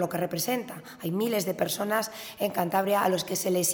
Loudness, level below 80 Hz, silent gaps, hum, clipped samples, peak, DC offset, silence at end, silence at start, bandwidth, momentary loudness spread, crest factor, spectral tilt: -28 LUFS; -68 dBFS; none; none; under 0.1%; -10 dBFS; under 0.1%; 0 s; 0 s; over 20 kHz; 8 LU; 18 dB; -4 dB/octave